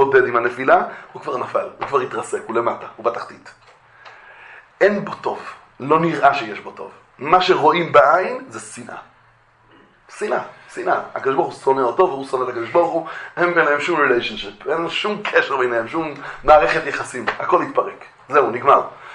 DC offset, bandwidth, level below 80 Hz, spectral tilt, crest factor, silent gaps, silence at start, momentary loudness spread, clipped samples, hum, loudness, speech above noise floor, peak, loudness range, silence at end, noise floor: under 0.1%; 11 kHz; -52 dBFS; -5 dB/octave; 20 dB; none; 0 s; 17 LU; under 0.1%; none; -18 LUFS; 35 dB; 0 dBFS; 7 LU; 0 s; -54 dBFS